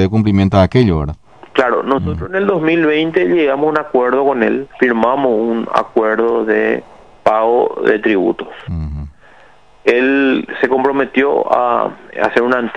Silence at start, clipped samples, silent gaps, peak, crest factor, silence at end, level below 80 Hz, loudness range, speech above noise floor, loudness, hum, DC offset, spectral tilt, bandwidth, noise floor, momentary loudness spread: 0 s; 0.1%; none; 0 dBFS; 14 dB; 0 s; -36 dBFS; 2 LU; 33 dB; -14 LUFS; none; 0.4%; -8 dB/octave; 9.6 kHz; -46 dBFS; 8 LU